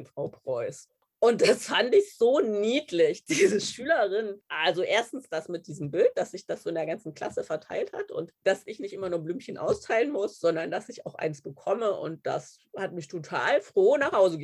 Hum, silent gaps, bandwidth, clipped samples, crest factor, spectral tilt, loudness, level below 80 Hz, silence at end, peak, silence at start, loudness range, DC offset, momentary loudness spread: none; none; 12.5 kHz; under 0.1%; 18 dB; -4 dB/octave; -27 LUFS; -70 dBFS; 0 s; -10 dBFS; 0 s; 7 LU; under 0.1%; 13 LU